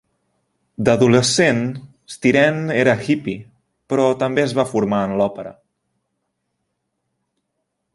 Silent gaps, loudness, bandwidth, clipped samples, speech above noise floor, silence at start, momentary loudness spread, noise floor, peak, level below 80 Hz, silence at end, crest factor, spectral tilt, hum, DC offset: none; -17 LUFS; 11.5 kHz; under 0.1%; 58 dB; 0.8 s; 19 LU; -75 dBFS; -2 dBFS; -56 dBFS; 2.4 s; 18 dB; -5 dB/octave; none; under 0.1%